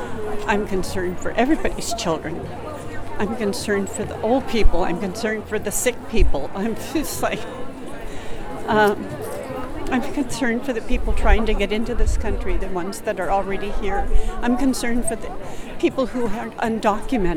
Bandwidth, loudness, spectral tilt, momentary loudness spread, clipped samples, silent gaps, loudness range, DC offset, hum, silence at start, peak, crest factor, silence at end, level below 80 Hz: 15.5 kHz; -23 LUFS; -5 dB/octave; 11 LU; under 0.1%; none; 2 LU; under 0.1%; none; 0 s; -2 dBFS; 18 dB; 0 s; -26 dBFS